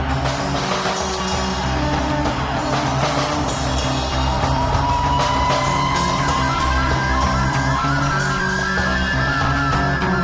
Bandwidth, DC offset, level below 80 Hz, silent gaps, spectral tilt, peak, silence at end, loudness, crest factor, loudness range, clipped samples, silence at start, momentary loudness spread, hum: 8 kHz; under 0.1%; -28 dBFS; none; -4.5 dB/octave; -4 dBFS; 0 s; -19 LUFS; 14 dB; 2 LU; under 0.1%; 0 s; 3 LU; none